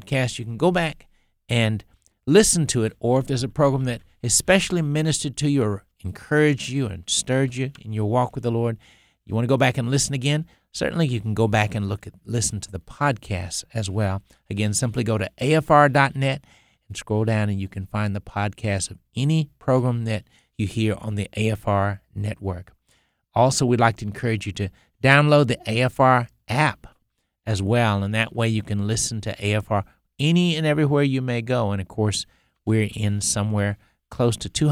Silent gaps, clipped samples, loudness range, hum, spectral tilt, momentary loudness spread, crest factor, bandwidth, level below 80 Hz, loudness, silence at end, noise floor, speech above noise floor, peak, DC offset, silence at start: none; under 0.1%; 5 LU; none; -5 dB/octave; 12 LU; 22 dB; 15 kHz; -48 dBFS; -22 LUFS; 0 s; -71 dBFS; 49 dB; 0 dBFS; under 0.1%; 0 s